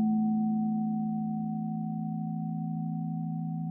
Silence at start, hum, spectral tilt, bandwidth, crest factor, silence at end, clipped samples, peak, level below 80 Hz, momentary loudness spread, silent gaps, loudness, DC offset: 0 s; none; -14.5 dB/octave; 0.9 kHz; 10 dB; 0 s; under 0.1%; -20 dBFS; -70 dBFS; 6 LU; none; -32 LUFS; under 0.1%